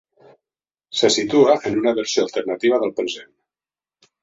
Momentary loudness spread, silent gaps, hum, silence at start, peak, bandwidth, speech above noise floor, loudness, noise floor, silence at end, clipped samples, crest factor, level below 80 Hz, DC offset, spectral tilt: 11 LU; none; none; 0.95 s; -2 dBFS; 8 kHz; over 72 dB; -19 LUFS; under -90 dBFS; 1 s; under 0.1%; 18 dB; -62 dBFS; under 0.1%; -3.5 dB/octave